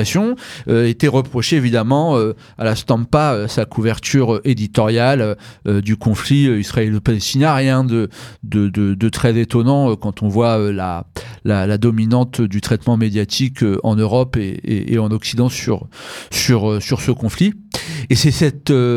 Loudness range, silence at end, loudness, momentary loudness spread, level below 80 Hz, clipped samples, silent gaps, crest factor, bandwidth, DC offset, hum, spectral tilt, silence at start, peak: 2 LU; 0 s; -17 LUFS; 7 LU; -42 dBFS; under 0.1%; none; 14 dB; 14.5 kHz; under 0.1%; none; -6 dB/octave; 0 s; 0 dBFS